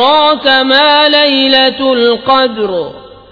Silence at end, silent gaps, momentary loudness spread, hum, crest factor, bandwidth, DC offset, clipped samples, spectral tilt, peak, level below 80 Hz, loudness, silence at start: 0.25 s; none; 10 LU; none; 10 dB; 5.4 kHz; under 0.1%; 0.3%; -4.5 dB/octave; 0 dBFS; -48 dBFS; -8 LUFS; 0 s